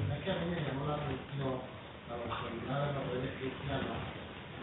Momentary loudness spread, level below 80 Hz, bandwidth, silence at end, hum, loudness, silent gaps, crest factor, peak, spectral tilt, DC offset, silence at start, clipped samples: 9 LU; -56 dBFS; 4.1 kHz; 0 s; none; -38 LUFS; none; 14 dB; -22 dBFS; -5 dB/octave; under 0.1%; 0 s; under 0.1%